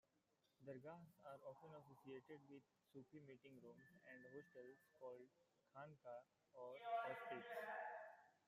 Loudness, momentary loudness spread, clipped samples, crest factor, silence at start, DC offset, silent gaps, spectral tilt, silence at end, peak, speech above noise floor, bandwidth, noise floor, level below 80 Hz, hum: -57 LUFS; 15 LU; under 0.1%; 22 dB; 0.6 s; under 0.1%; none; -6 dB/octave; 0.1 s; -36 dBFS; 29 dB; 15 kHz; -86 dBFS; under -90 dBFS; none